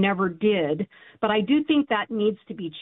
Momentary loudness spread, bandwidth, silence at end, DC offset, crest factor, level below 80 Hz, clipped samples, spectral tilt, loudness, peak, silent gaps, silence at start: 11 LU; 4 kHz; 0 s; under 0.1%; 14 dB; -64 dBFS; under 0.1%; -10.5 dB/octave; -24 LUFS; -10 dBFS; none; 0 s